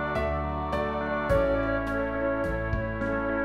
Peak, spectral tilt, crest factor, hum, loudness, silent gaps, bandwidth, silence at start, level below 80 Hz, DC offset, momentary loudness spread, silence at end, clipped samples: -12 dBFS; -8 dB/octave; 14 dB; none; -28 LUFS; none; 13 kHz; 0 s; -38 dBFS; 0.2%; 5 LU; 0 s; under 0.1%